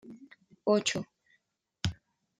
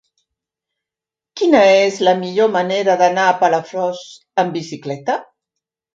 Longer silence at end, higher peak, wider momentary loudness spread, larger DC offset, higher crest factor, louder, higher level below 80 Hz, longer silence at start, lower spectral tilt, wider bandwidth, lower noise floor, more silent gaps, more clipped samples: second, 0.45 s vs 0.7 s; second, -14 dBFS vs 0 dBFS; first, 23 LU vs 13 LU; neither; first, 22 dB vs 16 dB; second, -32 LUFS vs -16 LUFS; first, -60 dBFS vs -66 dBFS; second, 0.05 s vs 1.35 s; about the same, -4 dB/octave vs -4.5 dB/octave; first, 12.5 kHz vs 7.8 kHz; second, -76 dBFS vs -88 dBFS; neither; neither